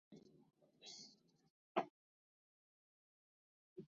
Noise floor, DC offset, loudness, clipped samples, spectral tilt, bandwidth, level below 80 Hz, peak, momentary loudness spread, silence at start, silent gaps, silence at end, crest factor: -67 dBFS; under 0.1%; -49 LUFS; under 0.1%; -3 dB/octave; 7.4 kHz; under -90 dBFS; -24 dBFS; 19 LU; 0.1 s; 1.50-1.75 s, 1.90-3.76 s; 0 s; 30 dB